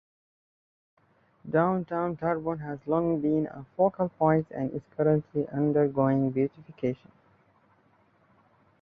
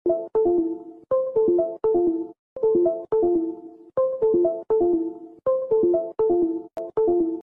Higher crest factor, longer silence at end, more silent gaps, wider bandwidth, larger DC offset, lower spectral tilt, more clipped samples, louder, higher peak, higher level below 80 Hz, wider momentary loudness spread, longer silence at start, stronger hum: first, 18 dB vs 10 dB; first, 1.85 s vs 0 s; second, none vs 2.39-2.56 s; first, 4.8 kHz vs 1.8 kHz; neither; about the same, -11.5 dB/octave vs -11.5 dB/octave; neither; second, -28 LUFS vs -23 LUFS; about the same, -10 dBFS vs -12 dBFS; about the same, -62 dBFS vs -58 dBFS; about the same, 8 LU vs 10 LU; first, 1.45 s vs 0.05 s; neither